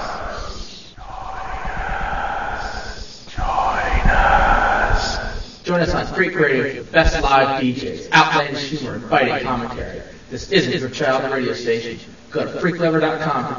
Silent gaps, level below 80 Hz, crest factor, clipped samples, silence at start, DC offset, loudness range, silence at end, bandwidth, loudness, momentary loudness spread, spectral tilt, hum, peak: none; -28 dBFS; 20 dB; under 0.1%; 0 s; 0.4%; 7 LU; 0 s; 7.4 kHz; -19 LUFS; 16 LU; -5 dB/octave; none; 0 dBFS